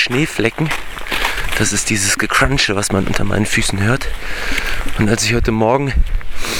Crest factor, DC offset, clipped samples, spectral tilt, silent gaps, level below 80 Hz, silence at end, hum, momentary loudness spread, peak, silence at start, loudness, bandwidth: 16 dB; under 0.1%; under 0.1%; -3.5 dB/octave; none; -24 dBFS; 0 s; none; 8 LU; 0 dBFS; 0 s; -16 LUFS; 18 kHz